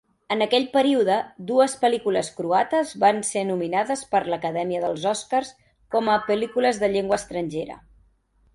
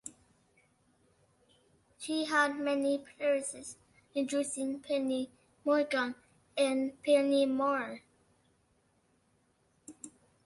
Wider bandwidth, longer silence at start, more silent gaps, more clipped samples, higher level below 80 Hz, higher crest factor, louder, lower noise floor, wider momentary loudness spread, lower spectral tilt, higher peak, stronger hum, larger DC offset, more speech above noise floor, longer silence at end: about the same, 11.5 kHz vs 11.5 kHz; first, 0.3 s vs 0.05 s; neither; neither; first, -60 dBFS vs -78 dBFS; about the same, 18 dB vs 20 dB; first, -23 LUFS vs -32 LUFS; second, -62 dBFS vs -72 dBFS; second, 7 LU vs 20 LU; first, -4 dB/octave vs -2.5 dB/octave; first, -6 dBFS vs -16 dBFS; neither; neither; about the same, 39 dB vs 41 dB; first, 0.8 s vs 0.4 s